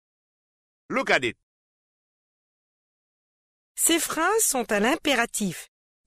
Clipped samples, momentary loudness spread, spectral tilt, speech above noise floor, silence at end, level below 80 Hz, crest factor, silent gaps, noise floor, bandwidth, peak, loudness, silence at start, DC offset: under 0.1%; 10 LU; -2 dB/octave; over 66 dB; 0.4 s; -60 dBFS; 22 dB; 1.43-3.75 s; under -90 dBFS; 15.5 kHz; -6 dBFS; -23 LUFS; 0.9 s; under 0.1%